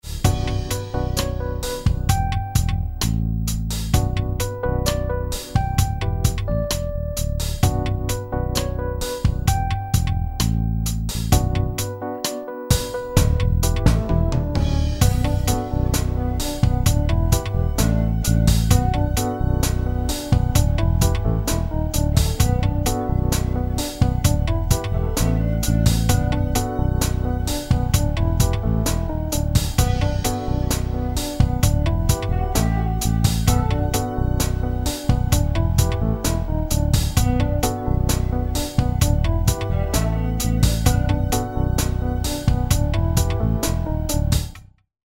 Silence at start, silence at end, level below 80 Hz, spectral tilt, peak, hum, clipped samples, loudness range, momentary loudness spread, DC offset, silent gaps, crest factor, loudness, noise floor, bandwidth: 0.05 s; 0.45 s; -24 dBFS; -5.5 dB/octave; 0 dBFS; none; under 0.1%; 3 LU; 5 LU; under 0.1%; none; 18 dB; -21 LUFS; -41 dBFS; 16.5 kHz